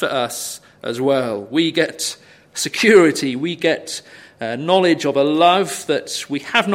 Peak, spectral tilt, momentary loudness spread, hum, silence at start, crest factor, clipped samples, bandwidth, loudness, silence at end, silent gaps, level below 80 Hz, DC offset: 0 dBFS; -3.5 dB/octave; 16 LU; none; 0 s; 18 dB; under 0.1%; 16.5 kHz; -17 LUFS; 0 s; none; -66 dBFS; under 0.1%